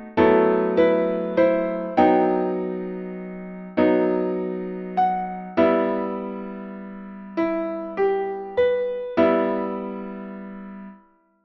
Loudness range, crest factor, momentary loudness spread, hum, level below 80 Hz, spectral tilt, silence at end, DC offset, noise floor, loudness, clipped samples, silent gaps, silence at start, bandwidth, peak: 4 LU; 18 dB; 17 LU; none; -56 dBFS; -9 dB/octave; 0.5 s; under 0.1%; -55 dBFS; -22 LUFS; under 0.1%; none; 0 s; 6 kHz; -4 dBFS